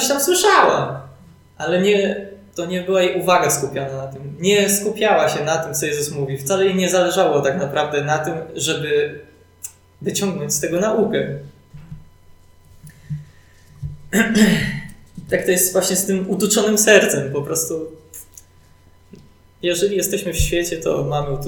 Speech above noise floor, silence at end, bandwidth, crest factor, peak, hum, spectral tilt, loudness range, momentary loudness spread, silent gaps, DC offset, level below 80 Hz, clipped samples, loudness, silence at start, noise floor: 31 dB; 0 s; 19 kHz; 18 dB; 0 dBFS; none; -3.5 dB/octave; 7 LU; 18 LU; none; under 0.1%; -40 dBFS; under 0.1%; -18 LUFS; 0 s; -49 dBFS